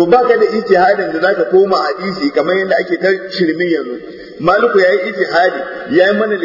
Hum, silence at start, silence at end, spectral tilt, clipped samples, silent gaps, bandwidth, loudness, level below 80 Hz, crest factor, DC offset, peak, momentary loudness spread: none; 0 s; 0 s; -6.5 dB/octave; under 0.1%; none; 5.8 kHz; -13 LUFS; -52 dBFS; 12 dB; under 0.1%; 0 dBFS; 7 LU